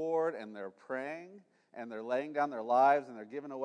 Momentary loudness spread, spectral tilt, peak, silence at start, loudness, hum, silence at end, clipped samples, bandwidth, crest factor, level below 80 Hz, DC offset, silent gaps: 19 LU; -6 dB/octave; -16 dBFS; 0 s; -33 LUFS; none; 0 s; under 0.1%; 10 kHz; 18 dB; under -90 dBFS; under 0.1%; none